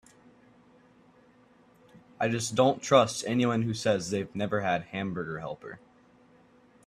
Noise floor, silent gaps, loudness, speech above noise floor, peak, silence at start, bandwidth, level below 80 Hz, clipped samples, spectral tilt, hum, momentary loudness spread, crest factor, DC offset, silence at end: -60 dBFS; none; -28 LUFS; 32 dB; -6 dBFS; 2.2 s; 14 kHz; -66 dBFS; under 0.1%; -5 dB/octave; none; 15 LU; 24 dB; under 0.1%; 1.1 s